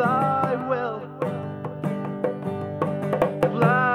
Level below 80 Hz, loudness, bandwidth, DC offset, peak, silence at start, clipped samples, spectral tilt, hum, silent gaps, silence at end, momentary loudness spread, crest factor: -58 dBFS; -25 LUFS; 13 kHz; under 0.1%; -6 dBFS; 0 s; under 0.1%; -8 dB/octave; 50 Hz at -40 dBFS; none; 0 s; 9 LU; 18 dB